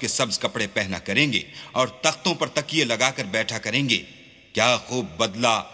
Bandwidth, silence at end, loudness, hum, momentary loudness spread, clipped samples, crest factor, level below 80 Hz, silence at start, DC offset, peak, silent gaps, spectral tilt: 8 kHz; 0 s; -23 LUFS; none; 5 LU; under 0.1%; 22 dB; -56 dBFS; 0 s; under 0.1%; -2 dBFS; none; -3 dB/octave